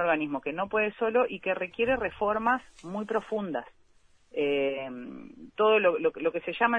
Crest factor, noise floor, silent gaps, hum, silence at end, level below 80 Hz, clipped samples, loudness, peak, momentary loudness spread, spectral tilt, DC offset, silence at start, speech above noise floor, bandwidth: 20 dB; -62 dBFS; none; none; 0 s; -60 dBFS; under 0.1%; -28 LUFS; -8 dBFS; 14 LU; -6.5 dB/octave; under 0.1%; 0 s; 33 dB; 8.8 kHz